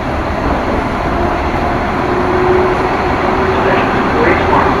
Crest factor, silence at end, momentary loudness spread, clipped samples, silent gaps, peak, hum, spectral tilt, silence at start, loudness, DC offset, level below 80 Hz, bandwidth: 12 dB; 0 s; 4 LU; under 0.1%; none; 0 dBFS; none; -7 dB/octave; 0 s; -13 LUFS; under 0.1%; -24 dBFS; 13 kHz